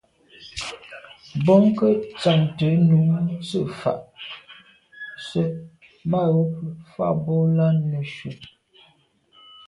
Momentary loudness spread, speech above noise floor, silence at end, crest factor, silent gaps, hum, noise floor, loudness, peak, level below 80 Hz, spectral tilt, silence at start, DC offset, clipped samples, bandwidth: 20 LU; 40 dB; 1.25 s; 18 dB; none; none; -60 dBFS; -21 LUFS; -4 dBFS; -58 dBFS; -8 dB/octave; 0.4 s; under 0.1%; under 0.1%; 11 kHz